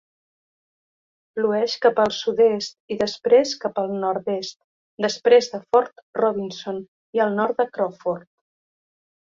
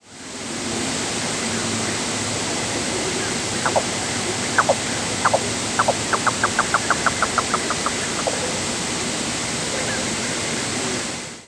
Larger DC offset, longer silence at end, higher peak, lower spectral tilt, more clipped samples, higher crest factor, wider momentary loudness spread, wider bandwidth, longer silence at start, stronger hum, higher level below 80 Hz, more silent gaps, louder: neither; first, 1.2 s vs 0 s; about the same, -2 dBFS vs -2 dBFS; first, -4 dB/octave vs -2 dB/octave; neither; about the same, 20 dB vs 22 dB; first, 12 LU vs 4 LU; second, 7.6 kHz vs 11 kHz; first, 1.35 s vs 0.05 s; neither; second, -66 dBFS vs -48 dBFS; first, 2.80-2.88 s, 4.64-4.98 s, 6.02-6.13 s, 6.88-7.13 s vs none; about the same, -22 LUFS vs -21 LUFS